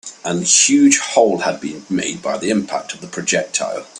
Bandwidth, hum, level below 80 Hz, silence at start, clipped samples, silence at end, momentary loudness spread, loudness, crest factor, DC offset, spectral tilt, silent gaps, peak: 12.5 kHz; none; -60 dBFS; 0.05 s; under 0.1%; 0 s; 13 LU; -16 LUFS; 18 dB; under 0.1%; -2.5 dB/octave; none; 0 dBFS